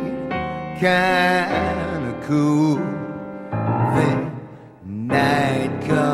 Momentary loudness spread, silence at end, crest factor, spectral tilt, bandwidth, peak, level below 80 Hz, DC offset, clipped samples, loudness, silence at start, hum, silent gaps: 14 LU; 0 s; 16 dB; -6.5 dB/octave; 14.5 kHz; -4 dBFS; -46 dBFS; under 0.1%; under 0.1%; -20 LUFS; 0 s; none; none